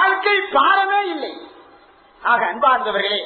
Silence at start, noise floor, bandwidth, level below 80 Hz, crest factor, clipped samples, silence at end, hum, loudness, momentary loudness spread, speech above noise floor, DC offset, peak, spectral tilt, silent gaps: 0 s; -49 dBFS; 4.5 kHz; -62 dBFS; 18 dB; under 0.1%; 0 s; none; -17 LUFS; 13 LU; 31 dB; under 0.1%; -2 dBFS; -5.5 dB/octave; none